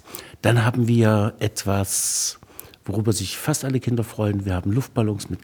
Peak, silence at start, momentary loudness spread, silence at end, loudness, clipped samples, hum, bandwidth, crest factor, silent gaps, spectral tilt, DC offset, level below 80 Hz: -2 dBFS; 0.05 s; 7 LU; 0.05 s; -22 LUFS; under 0.1%; none; over 20 kHz; 20 dB; none; -5 dB/octave; under 0.1%; -52 dBFS